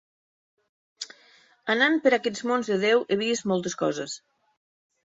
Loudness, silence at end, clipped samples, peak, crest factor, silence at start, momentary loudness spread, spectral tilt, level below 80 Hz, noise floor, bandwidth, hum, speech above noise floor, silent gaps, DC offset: -24 LUFS; 0.9 s; under 0.1%; -6 dBFS; 20 dB; 1 s; 18 LU; -4 dB/octave; -70 dBFS; -58 dBFS; 8 kHz; none; 34 dB; none; under 0.1%